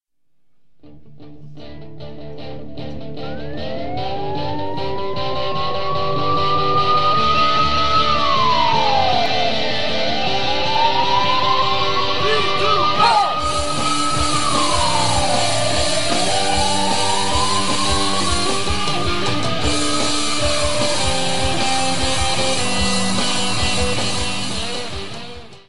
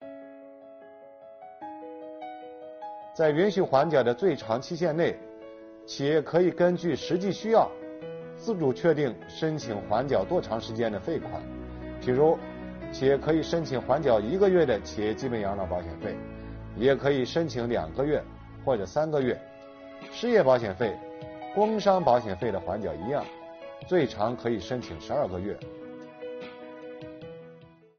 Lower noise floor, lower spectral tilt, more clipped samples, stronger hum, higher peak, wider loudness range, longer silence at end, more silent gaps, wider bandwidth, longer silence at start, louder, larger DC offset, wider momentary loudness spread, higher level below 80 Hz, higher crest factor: first, -58 dBFS vs -52 dBFS; second, -3 dB/octave vs -5.5 dB/octave; neither; neither; first, -4 dBFS vs -8 dBFS; first, 10 LU vs 5 LU; second, 0 s vs 0.35 s; neither; first, 12 kHz vs 6.8 kHz; about the same, 0 s vs 0 s; first, -18 LUFS vs -27 LUFS; first, 9% vs under 0.1%; second, 13 LU vs 19 LU; first, -36 dBFS vs -52 dBFS; about the same, 16 dB vs 20 dB